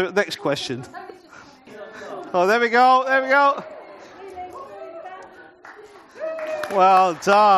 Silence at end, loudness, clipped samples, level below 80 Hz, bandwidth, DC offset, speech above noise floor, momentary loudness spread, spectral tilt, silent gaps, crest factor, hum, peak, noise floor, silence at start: 0 s; -19 LUFS; under 0.1%; -68 dBFS; 13 kHz; under 0.1%; 29 dB; 24 LU; -4 dB/octave; none; 18 dB; none; -2 dBFS; -46 dBFS; 0 s